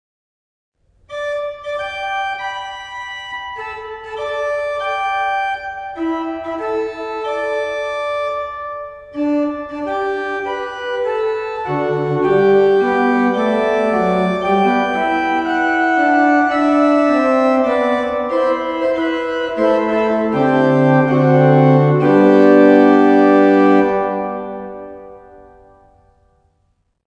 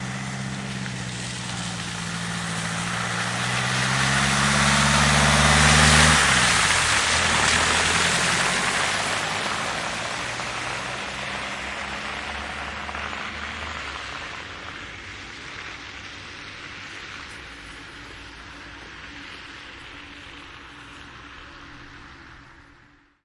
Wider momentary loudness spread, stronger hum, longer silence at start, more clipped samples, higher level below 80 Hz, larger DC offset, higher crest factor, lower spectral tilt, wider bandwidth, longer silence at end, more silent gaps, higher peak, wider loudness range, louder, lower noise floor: second, 15 LU vs 23 LU; neither; first, 1.1 s vs 0 s; neither; second, -52 dBFS vs -40 dBFS; neither; second, 16 dB vs 22 dB; first, -7.5 dB/octave vs -2.5 dB/octave; second, 8.6 kHz vs 11.5 kHz; first, 1.9 s vs 0.65 s; neither; about the same, 0 dBFS vs -2 dBFS; second, 12 LU vs 23 LU; first, -16 LUFS vs -21 LUFS; first, -64 dBFS vs -55 dBFS